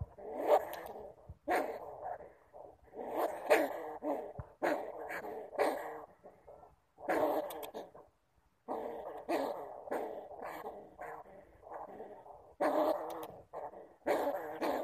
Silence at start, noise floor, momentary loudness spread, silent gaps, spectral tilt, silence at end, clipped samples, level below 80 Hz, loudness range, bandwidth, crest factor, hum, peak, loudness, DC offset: 0 s; -74 dBFS; 21 LU; none; -5 dB/octave; 0 s; under 0.1%; -68 dBFS; 6 LU; 15 kHz; 24 dB; none; -14 dBFS; -38 LUFS; under 0.1%